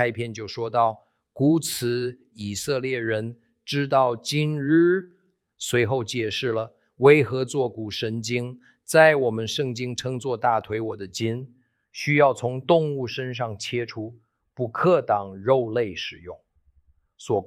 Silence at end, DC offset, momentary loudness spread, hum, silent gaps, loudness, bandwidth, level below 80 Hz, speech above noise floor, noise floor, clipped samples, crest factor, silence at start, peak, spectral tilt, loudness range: 0 s; under 0.1%; 14 LU; none; none; -23 LUFS; 16.5 kHz; -64 dBFS; 39 dB; -62 dBFS; under 0.1%; 22 dB; 0 s; -2 dBFS; -5.5 dB/octave; 4 LU